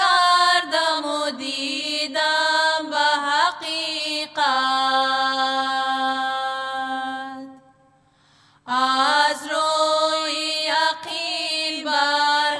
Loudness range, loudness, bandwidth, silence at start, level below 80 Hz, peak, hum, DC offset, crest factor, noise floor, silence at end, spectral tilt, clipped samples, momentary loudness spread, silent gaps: 4 LU; -20 LUFS; 11 kHz; 0 s; -76 dBFS; -6 dBFS; none; under 0.1%; 16 dB; -58 dBFS; 0 s; 0 dB/octave; under 0.1%; 8 LU; none